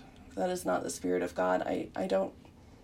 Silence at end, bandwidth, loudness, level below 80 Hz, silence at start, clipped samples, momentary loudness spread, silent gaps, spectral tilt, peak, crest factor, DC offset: 0.1 s; 16 kHz; -33 LUFS; -62 dBFS; 0 s; under 0.1%; 5 LU; none; -5 dB/octave; -16 dBFS; 16 dB; under 0.1%